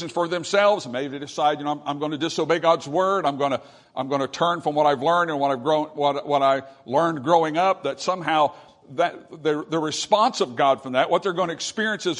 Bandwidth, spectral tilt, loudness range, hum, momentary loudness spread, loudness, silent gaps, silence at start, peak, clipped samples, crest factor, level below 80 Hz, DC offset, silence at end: 11 kHz; -4.5 dB/octave; 2 LU; none; 7 LU; -23 LUFS; none; 0 s; -4 dBFS; under 0.1%; 20 dB; -70 dBFS; under 0.1%; 0 s